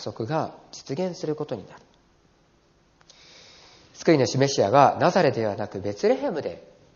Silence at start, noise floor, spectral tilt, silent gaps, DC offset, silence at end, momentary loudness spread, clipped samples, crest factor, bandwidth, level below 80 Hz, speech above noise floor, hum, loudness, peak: 0 s; -61 dBFS; -5 dB/octave; none; under 0.1%; 0.35 s; 16 LU; under 0.1%; 24 dB; 7.2 kHz; -66 dBFS; 38 dB; none; -23 LUFS; -2 dBFS